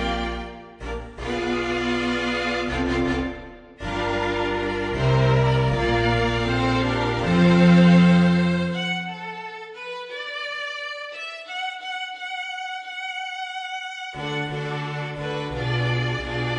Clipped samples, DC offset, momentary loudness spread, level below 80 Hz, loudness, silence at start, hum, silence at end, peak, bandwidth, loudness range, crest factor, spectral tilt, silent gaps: under 0.1%; under 0.1%; 15 LU; -38 dBFS; -23 LUFS; 0 s; none; 0 s; -6 dBFS; 9.4 kHz; 12 LU; 18 dB; -6.5 dB/octave; none